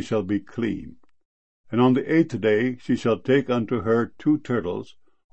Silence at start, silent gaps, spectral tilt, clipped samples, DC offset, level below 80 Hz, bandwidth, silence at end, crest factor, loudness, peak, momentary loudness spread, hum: 0 s; 1.25-1.64 s; -7.5 dB/octave; under 0.1%; 0.5%; -58 dBFS; 8.4 kHz; 0.5 s; 18 dB; -23 LUFS; -6 dBFS; 9 LU; none